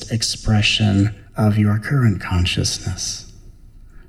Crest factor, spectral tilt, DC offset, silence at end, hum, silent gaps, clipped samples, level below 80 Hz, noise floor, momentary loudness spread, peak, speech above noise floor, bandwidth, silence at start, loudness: 14 dB; -4.5 dB/octave; under 0.1%; 0.05 s; none; none; under 0.1%; -36 dBFS; -41 dBFS; 8 LU; -4 dBFS; 24 dB; 14 kHz; 0 s; -18 LUFS